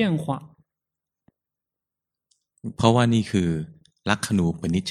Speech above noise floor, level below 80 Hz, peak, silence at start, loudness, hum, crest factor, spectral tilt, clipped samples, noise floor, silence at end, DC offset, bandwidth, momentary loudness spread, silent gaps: 66 dB; -52 dBFS; 0 dBFS; 0 s; -23 LUFS; none; 24 dB; -6 dB/octave; under 0.1%; -88 dBFS; 0 s; under 0.1%; 13.5 kHz; 16 LU; none